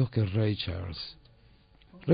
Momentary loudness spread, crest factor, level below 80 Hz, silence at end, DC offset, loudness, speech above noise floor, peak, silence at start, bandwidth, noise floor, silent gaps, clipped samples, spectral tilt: 12 LU; 20 dB; -52 dBFS; 0 s; under 0.1%; -32 LUFS; 29 dB; -10 dBFS; 0 s; 5.2 kHz; -59 dBFS; none; under 0.1%; -11 dB/octave